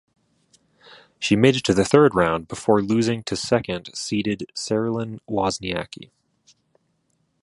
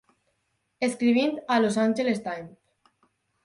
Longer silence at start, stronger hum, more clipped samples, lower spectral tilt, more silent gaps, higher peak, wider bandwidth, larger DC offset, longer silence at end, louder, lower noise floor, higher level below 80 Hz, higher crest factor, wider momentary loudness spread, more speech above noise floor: first, 1.2 s vs 0.8 s; neither; neither; about the same, -5 dB/octave vs -5 dB/octave; neither; first, 0 dBFS vs -10 dBFS; about the same, 11.5 kHz vs 11.5 kHz; neither; first, 1.4 s vs 0.95 s; first, -21 LUFS vs -25 LUFS; second, -69 dBFS vs -75 dBFS; first, -52 dBFS vs -72 dBFS; about the same, 22 dB vs 18 dB; about the same, 12 LU vs 13 LU; about the same, 48 dB vs 51 dB